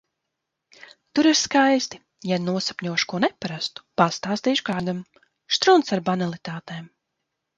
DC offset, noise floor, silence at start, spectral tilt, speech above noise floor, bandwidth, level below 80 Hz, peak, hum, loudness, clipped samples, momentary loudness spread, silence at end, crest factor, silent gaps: under 0.1%; -81 dBFS; 1.15 s; -4 dB/octave; 59 dB; 9.2 kHz; -66 dBFS; -2 dBFS; none; -22 LUFS; under 0.1%; 16 LU; 0.7 s; 22 dB; none